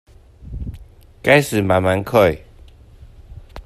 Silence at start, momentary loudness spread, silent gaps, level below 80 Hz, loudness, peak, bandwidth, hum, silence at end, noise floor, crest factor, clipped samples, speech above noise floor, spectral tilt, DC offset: 0.45 s; 20 LU; none; -38 dBFS; -16 LUFS; 0 dBFS; 14.5 kHz; none; 0.05 s; -44 dBFS; 20 dB; under 0.1%; 29 dB; -5.5 dB/octave; under 0.1%